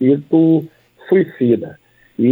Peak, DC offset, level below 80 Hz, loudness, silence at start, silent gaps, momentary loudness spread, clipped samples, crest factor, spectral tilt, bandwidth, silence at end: -2 dBFS; under 0.1%; -64 dBFS; -15 LUFS; 0 s; none; 20 LU; under 0.1%; 14 dB; -11 dB/octave; 4 kHz; 0 s